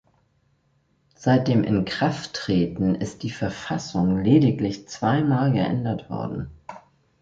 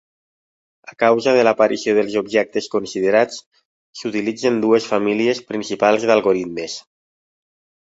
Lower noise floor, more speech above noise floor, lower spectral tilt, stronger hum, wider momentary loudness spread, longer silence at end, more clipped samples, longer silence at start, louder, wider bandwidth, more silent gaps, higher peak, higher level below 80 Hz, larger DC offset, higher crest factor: second, -66 dBFS vs under -90 dBFS; second, 44 dB vs over 72 dB; first, -7 dB/octave vs -4.5 dB/octave; neither; about the same, 12 LU vs 11 LU; second, 0.4 s vs 1.15 s; neither; first, 1.2 s vs 0.85 s; second, -23 LUFS vs -18 LUFS; about the same, 7.8 kHz vs 8 kHz; second, none vs 3.46-3.51 s, 3.65-3.93 s; second, -6 dBFS vs -2 dBFS; first, -50 dBFS vs -62 dBFS; neither; about the same, 18 dB vs 18 dB